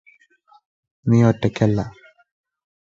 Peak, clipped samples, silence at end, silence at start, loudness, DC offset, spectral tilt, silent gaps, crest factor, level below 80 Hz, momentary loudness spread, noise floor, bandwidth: -2 dBFS; under 0.1%; 1.05 s; 1.05 s; -19 LUFS; under 0.1%; -8 dB/octave; none; 20 dB; -50 dBFS; 12 LU; -56 dBFS; 7.6 kHz